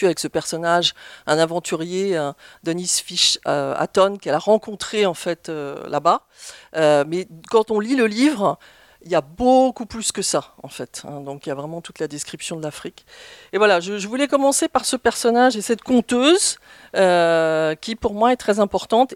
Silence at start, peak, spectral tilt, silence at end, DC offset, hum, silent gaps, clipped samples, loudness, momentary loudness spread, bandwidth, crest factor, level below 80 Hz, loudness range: 0 s; -2 dBFS; -3.5 dB/octave; 0 s; under 0.1%; none; none; under 0.1%; -19 LUFS; 13 LU; 16.5 kHz; 18 dB; -54 dBFS; 6 LU